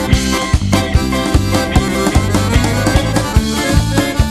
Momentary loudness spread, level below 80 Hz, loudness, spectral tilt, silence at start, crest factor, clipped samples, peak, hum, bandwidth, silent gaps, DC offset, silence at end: 1 LU; -18 dBFS; -14 LUFS; -5 dB/octave; 0 s; 12 dB; under 0.1%; 0 dBFS; none; 14.5 kHz; none; under 0.1%; 0 s